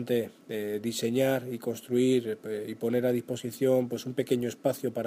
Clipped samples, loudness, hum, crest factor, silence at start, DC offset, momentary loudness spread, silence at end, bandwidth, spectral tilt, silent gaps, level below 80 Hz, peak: under 0.1%; -30 LUFS; none; 16 dB; 0 s; under 0.1%; 9 LU; 0 s; 15.5 kHz; -5.5 dB/octave; none; -74 dBFS; -12 dBFS